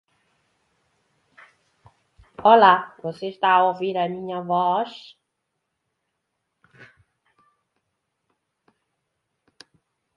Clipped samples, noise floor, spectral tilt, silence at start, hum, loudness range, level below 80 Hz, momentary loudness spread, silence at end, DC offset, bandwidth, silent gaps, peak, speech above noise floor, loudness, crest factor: under 0.1%; -78 dBFS; -6.5 dB/octave; 2.4 s; none; 10 LU; -70 dBFS; 18 LU; 5.2 s; under 0.1%; 7 kHz; none; -2 dBFS; 59 dB; -20 LUFS; 24 dB